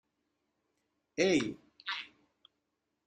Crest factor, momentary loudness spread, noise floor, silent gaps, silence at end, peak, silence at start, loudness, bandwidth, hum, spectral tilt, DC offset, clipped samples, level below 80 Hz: 24 dB; 15 LU; -84 dBFS; none; 1 s; -14 dBFS; 1.15 s; -34 LUFS; 9.2 kHz; none; -4 dB/octave; under 0.1%; under 0.1%; -74 dBFS